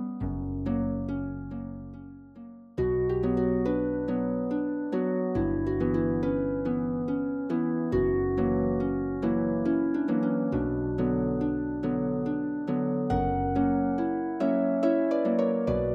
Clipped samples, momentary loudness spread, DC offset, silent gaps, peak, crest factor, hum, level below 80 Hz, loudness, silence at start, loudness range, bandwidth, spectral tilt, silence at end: under 0.1%; 7 LU; under 0.1%; none; -14 dBFS; 14 dB; none; -44 dBFS; -28 LUFS; 0 s; 3 LU; 6 kHz; -10.5 dB/octave; 0 s